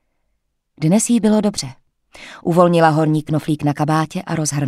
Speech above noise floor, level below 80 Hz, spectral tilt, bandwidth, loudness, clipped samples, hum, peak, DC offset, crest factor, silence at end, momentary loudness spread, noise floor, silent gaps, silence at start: 53 dB; -52 dBFS; -5.5 dB/octave; 14.5 kHz; -17 LUFS; under 0.1%; none; -2 dBFS; under 0.1%; 16 dB; 0 s; 11 LU; -69 dBFS; none; 0.8 s